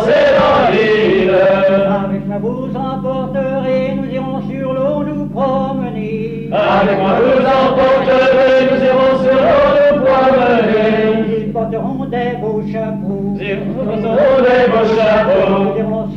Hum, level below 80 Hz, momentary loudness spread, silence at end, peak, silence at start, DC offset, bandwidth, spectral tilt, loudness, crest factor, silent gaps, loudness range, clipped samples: none; -40 dBFS; 10 LU; 0 s; -2 dBFS; 0 s; under 0.1%; 7 kHz; -7.5 dB/octave; -13 LUFS; 12 dB; none; 7 LU; under 0.1%